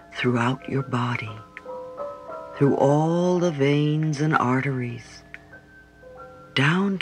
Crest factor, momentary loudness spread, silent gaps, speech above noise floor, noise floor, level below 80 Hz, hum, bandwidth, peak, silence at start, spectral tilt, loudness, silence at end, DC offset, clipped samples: 20 dB; 21 LU; none; 27 dB; -49 dBFS; -60 dBFS; none; 10 kHz; -4 dBFS; 0.1 s; -6.5 dB/octave; -23 LUFS; 0 s; under 0.1%; under 0.1%